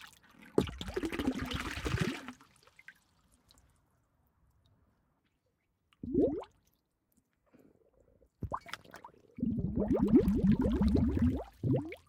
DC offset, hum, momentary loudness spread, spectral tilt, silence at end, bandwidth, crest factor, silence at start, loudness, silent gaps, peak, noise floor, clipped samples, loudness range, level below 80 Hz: under 0.1%; none; 20 LU; -7.5 dB/octave; 0.1 s; 16.5 kHz; 24 dB; 0 s; -33 LUFS; none; -12 dBFS; -79 dBFS; under 0.1%; 13 LU; -46 dBFS